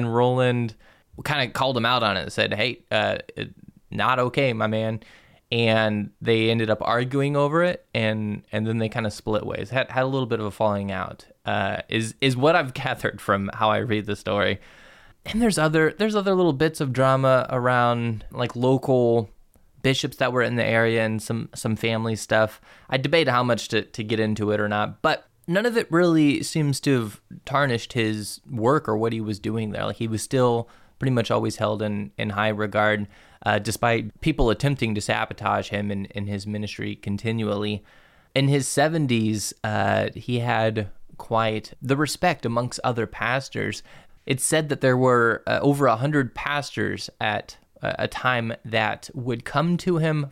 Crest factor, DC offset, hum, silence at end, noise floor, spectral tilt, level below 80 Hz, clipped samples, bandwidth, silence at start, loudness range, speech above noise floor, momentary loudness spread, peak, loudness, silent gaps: 16 dB; under 0.1%; none; 0 s; -54 dBFS; -5.5 dB/octave; -48 dBFS; under 0.1%; 16 kHz; 0 s; 3 LU; 31 dB; 9 LU; -8 dBFS; -23 LUFS; none